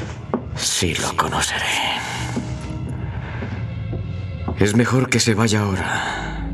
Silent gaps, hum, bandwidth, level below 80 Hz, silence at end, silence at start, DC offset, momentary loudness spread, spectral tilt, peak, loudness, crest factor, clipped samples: none; none; 14.5 kHz; -38 dBFS; 0 s; 0 s; under 0.1%; 11 LU; -4 dB/octave; -2 dBFS; -21 LUFS; 20 dB; under 0.1%